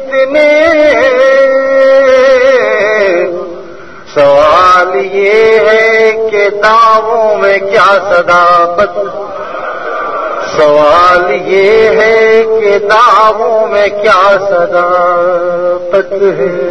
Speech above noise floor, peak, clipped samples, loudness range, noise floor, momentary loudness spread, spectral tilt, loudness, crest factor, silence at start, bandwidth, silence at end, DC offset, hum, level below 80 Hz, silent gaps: 22 dB; 0 dBFS; 1%; 3 LU; -29 dBFS; 10 LU; -4 dB/octave; -7 LUFS; 8 dB; 0 s; 9.6 kHz; 0 s; 2%; none; -42 dBFS; none